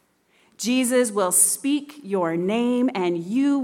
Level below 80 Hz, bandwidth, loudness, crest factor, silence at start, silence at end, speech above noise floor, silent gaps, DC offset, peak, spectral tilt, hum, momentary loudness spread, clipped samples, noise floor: -74 dBFS; 18 kHz; -21 LUFS; 18 dB; 0.6 s; 0 s; 40 dB; none; under 0.1%; -4 dBFS; -3.5 dB/octave; none; 9 LU; under 0.1%; -62 dBFS